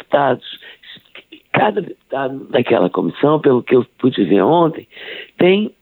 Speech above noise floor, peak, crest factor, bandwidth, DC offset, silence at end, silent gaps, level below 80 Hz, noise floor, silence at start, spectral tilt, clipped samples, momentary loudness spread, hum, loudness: 26 dB; 0 dBFS; 16 dB; 4.3 kHz; under 0.1%; 0.1 s; none; -62 dBFS; -42 dBFS; 0.1 s; -9.5 dB/octave; under 0.1%; 18 LU; none; -16 LUFS